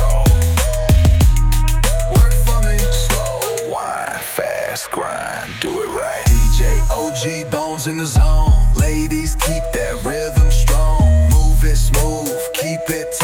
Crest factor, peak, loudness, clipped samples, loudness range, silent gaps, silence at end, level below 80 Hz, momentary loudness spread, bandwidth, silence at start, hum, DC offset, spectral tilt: 12 dB; -2 dBFS; -17 LUFS; under 0.1%; 4 LU; none; 0 s; -16 dBFS; 8 LU; 17.5 kHz; 0 s; none; under 0.1%; -5 dB/octave